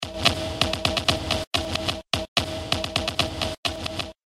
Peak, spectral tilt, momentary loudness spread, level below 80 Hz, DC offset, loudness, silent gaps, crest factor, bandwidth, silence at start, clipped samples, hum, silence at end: -2 dBFS; -3.5 dB/octave; 5 LU; -42 dBFS; under 0.1%; -25 LUFS; 1.47-1.51 s, 2.28-2.36 s, 3.58-3.63 s; 24 dB; 16 kHz; 0 s; under 0.1%; none; 0.15 s